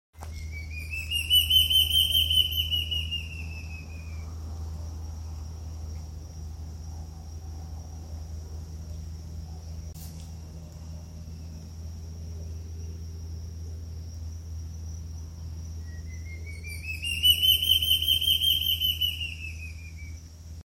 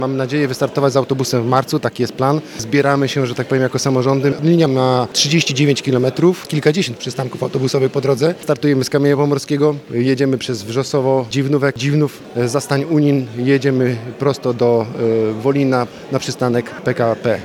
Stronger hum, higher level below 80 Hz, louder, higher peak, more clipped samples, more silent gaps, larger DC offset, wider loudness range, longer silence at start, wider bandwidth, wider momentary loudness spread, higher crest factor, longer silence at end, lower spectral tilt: neither; first, -44 dBFS vs -60 dBFS; second, -23 LUFS vs -16 LUFS; second, -10 dBFS vs 0 dBFS; neither; neither; neither; first, 18 LU vs 2 LU; first, 0.15 s vs 0 s; about the same, 16.5 kHz vs 16.5 kHz; first, 21 LU vs 5 LU; about the same, 20 dB vs 16 dB; about the same, 0.05 s vs 0 s; second, -2 dB/octave vs -5.5 dB/octave